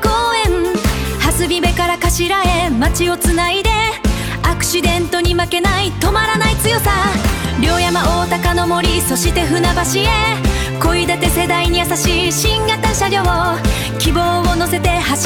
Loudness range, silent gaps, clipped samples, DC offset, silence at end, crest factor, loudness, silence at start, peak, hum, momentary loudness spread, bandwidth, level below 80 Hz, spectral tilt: 1 LU; none; under 0.1%; 0.3%; 0 s; 14 dB; -14 LUFS; 0 s; 0 dBFS; none; 3 LU; 19 kHz; -22 dBFS; -4 dB/octave